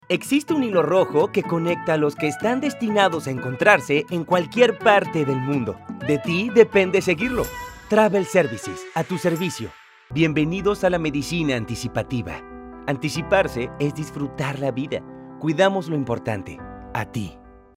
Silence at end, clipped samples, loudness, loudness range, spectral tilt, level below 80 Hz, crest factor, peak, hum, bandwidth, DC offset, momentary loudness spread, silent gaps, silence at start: 0.25 s; under 0.1%; -21 LUFS; 6 LU; -5.5 dB/octave; -48 dBFS; 22 dB; 0 dBFS; none; 16 kHz; under 0.1%; 13 LU; none; 0.1 s